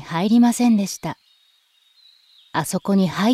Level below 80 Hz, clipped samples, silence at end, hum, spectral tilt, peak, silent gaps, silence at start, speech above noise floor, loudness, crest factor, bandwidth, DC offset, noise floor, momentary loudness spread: -62 dBFS; under 0.1%; 0 s; none; -5.5 dB/octave; -6 dBFS; none; 0 s; 42 dB; -19 LUFS; 14 dB; 15 kHz; under 0.1%; -60 dBFS; 14 LU